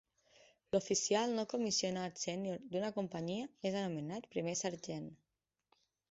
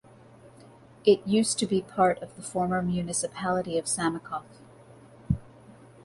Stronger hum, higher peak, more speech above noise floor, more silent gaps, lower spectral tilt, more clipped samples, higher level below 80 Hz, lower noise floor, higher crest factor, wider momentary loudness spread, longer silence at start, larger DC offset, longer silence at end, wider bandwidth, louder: neither; second, -20 dBFS vs -8 dBFS; first, 51 dB vs 26 dB; neither; about the same, -4.5 dB/octave vs -4.5 dB/octave; neither; second, -76 dBFS vs -52 dBFS; first, -89 dBFS vs -52 dBFS; about the same, 20 dB vs 20 dB; about the same, 9 LU vs 11 LU; first, 0.75 s vs 0.45 s; neither; first, 0.95 s vs 0.35 s; second, 8 kHz vs 11.5 kHz; second, -38 LUFS vs -27 LUFS